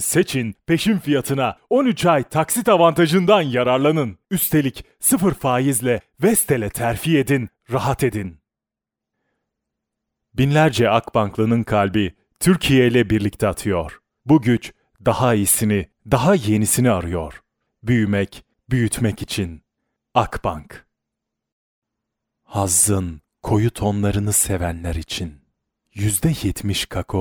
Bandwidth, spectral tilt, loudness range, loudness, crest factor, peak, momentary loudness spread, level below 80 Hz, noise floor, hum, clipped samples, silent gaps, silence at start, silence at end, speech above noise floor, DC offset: over 20 kHz; -5 dB/octave; 7 LU; -19 LUFS; 18 dB; -2 dBFS; 11 LU; -42 dBFS; -87 dBFS; none; under 0.1%; 21.52-21.82 s; 0 s; 0 s; 69 dB; under 0.1%